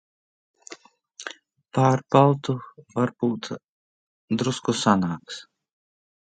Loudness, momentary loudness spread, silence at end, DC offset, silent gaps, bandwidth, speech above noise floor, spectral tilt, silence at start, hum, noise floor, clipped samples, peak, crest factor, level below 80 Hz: -23 LUFS; 20 LU; 1 s; under 0.1%; 3.64-4.28 s; 9.2 kHz; 25 dB; -6 dB/octave; 0.7 s; none; -48 dBFS; under 0.1%; -2 dBFS; 24 dB; -64 dBFS